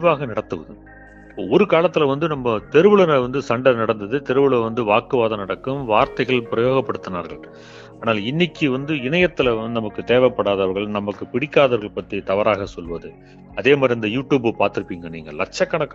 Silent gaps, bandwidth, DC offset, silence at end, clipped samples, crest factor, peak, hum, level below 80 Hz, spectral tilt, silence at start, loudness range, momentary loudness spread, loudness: none; 7.6 kHz; under 0.1%; 0 s; under 0.1%; 20 dB; 0 dBFS; none; -48 dBFS; -6.5 dB/octave; 0 s; 4 LU; 13 LU; -19 LUFS